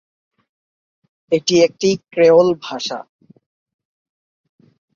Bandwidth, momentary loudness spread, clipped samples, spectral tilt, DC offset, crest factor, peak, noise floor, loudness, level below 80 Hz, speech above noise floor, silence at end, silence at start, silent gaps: 7.4 kHz; 13 LU; under 0.1%; -4.5 dB/octave; under 0.1%; 18 dB; -2 dBFS; under -90 dBFS; -16 LUFS; -62 dBFS; over 75 dB; 1.95 s; 1.3 s; none